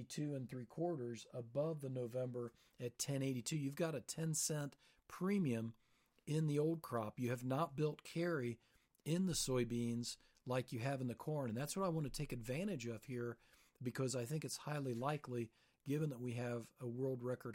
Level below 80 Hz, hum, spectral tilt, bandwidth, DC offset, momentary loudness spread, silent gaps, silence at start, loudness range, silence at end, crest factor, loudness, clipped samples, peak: -68 dBFS; none; -5.5 dB/octave; 16.5 kHz; under 0.1%; 10 LU; none; 0 s; 3 LU; 0 s; 16 dB; -43 LUFS; under 0.1%; -28 dBFS